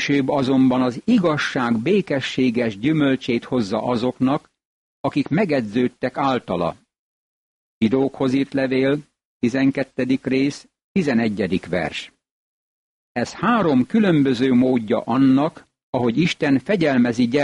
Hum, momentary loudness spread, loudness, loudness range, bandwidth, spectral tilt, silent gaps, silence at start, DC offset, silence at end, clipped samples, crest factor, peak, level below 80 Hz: none; 8 LU; -20 LUFS; 5 LU; 10.5 kHz; -6.5 dB/octave; 4.65-5.04 s, 6.99-7.81 s, 9.25-9.40 s, 10.84-10.95 s, 12.31-13.15 s, 15.83-15.93 s; 0 s; under 0.1%; 0 s; under 0.1%; 12 dB; -8 dBFS; -56 dBFS